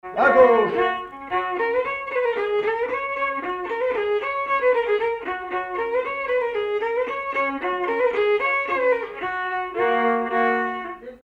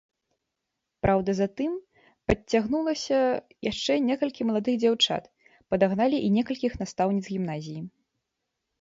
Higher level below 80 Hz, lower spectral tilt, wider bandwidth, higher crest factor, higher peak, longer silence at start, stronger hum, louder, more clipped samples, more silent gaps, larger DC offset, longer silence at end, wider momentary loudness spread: second, -58 dBFS vs -50 dBFS; about the same, -5.5 dB/octave vs -5.5 dB/octave; second, 6 kHz vs 7.8 kHz; about the same, 18 dB vs 22 dB; about the same, -4 dBFS vs -6 dBFS; second, 0.05 s vs 1.05 s; neither; first, -22 LUFS vs -26 LUFS; neither; neither; neither; second, 0.05 s vs 0.95 s; about the same, 8 LU vs 10 LU